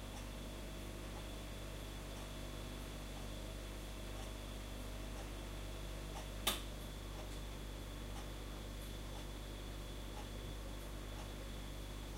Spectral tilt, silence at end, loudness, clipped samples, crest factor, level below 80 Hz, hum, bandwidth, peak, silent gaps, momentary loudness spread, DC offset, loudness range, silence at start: -4 dB/octave; 0 s; -48 LUFS; under 0.1%; 26 dB; -50 dBFS; 50 Hz at -50 dBFS; 16 kHz; -20 dBFS; none; 1 LU; under 0.1%; 3 LU; 0 s